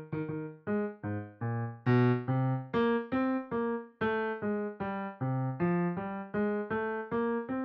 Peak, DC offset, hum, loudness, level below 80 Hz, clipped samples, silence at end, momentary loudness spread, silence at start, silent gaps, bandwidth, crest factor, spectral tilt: -14 dBFS; under 0.1%; none; -33 LUFS; -66 dBFS; under 0.1%; 0 s; 8 LU; 0 s; none; 5.4 kHz; 18 dB; -7.5 dB/octave